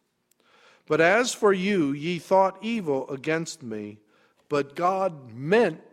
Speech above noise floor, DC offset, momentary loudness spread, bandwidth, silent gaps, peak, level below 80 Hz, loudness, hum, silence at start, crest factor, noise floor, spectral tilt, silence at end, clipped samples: 43 dB; under 0.1%; 14 LU; 15.5 kHz; none; -6 dBFS; -72 dBFS; -24 LUFS; none; 0.9 s; 20 dB; -68 dBFS; -5 dB/octave; 0.1 s; under 0.1%